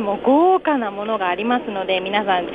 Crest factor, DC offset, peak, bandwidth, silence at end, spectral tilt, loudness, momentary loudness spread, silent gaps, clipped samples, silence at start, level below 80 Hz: 14 dB; under 0.1%; -4 dBFS; 5 kHz; 0 s; -7.5 dB/octave; -19 LUFS; 7 LU; none; under 0.1%; 0 s; -56 dBFS